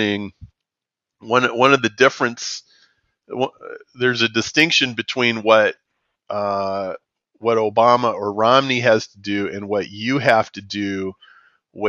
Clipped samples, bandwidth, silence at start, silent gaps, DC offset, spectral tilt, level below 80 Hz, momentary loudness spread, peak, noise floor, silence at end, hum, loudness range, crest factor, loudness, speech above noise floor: under 0.1%; 7.6 kHz; 0 s; none; under 0.1%; -2.5 dB/octave; -62 dBFS; 13 LU; 0 dBFS; -86 dBFS; 0 s; none; 2 LU; 20 dB; -18 LUFS; 68 dB